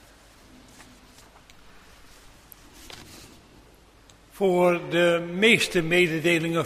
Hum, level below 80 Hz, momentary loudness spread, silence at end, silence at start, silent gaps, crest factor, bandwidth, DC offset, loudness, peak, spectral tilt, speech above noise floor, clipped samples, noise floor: none; -56 dBFS; 24 LU; 0 s; 2.8 s; none; 22 dB; 15.5 kHz; under 0.1%; -21 LUFS; -4 dBFS; -4.5 dB/octave; 32 dB; under 0.1%; -54 dBFS